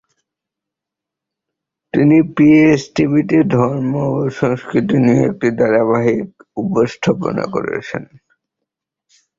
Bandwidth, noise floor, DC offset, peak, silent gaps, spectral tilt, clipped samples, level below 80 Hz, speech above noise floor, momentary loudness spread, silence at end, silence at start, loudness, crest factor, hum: 7.6 kHz; -84 dBFS; under 0.1%; -2 dBFS; none; -7.5 dB/octave; under 0.1%; -52 dBFS; 70 dB; 11 LU; 1.35 s; 1.95 s; -15 LUFS; 14 dB; none